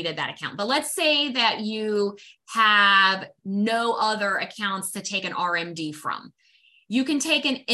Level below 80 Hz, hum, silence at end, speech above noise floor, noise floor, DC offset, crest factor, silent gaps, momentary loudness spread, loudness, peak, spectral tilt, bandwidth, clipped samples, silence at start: -74 dBFS; none; 0 s; 36 dB; -60 dBFS; under 0.1%; 18 dB; none; 13 LU; -23 LUFS; -6 dBFS; -2.5 dB/octave; 13.5 kHz; under 0.1%; 0 s